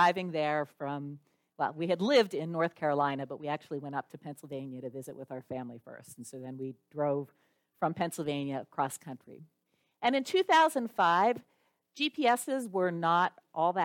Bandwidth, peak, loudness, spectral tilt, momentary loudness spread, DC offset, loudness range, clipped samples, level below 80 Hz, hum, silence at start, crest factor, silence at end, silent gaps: 17 kHz; -12 dBFS; -31 LUFS; -5 dB/octave; 18 LU; under 0.1%; 11 LU; under 0.1%; -80 dBFS; none; 0 s; 20 dB; 0 s; none